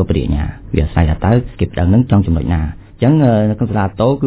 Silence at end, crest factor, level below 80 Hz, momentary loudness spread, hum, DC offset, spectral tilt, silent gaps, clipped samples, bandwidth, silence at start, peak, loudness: 0 s; 14 dB; -22 dBFS; 8 LU; none; under 0.1%; -12.5 dB/octave; none; 0.2%; 4 kHz; 0 s; 0 dBFS; -15 LUFS